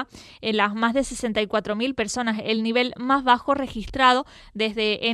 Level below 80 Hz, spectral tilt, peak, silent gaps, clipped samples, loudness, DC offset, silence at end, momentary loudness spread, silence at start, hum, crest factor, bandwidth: -48 dBFS; -3.5 dB/octave; -4 dBFS; none; under 0.1%; -23 LUFS; under 0.1%; 0 s; 8 LU; 0 s; none; 20 dB; 13 kHz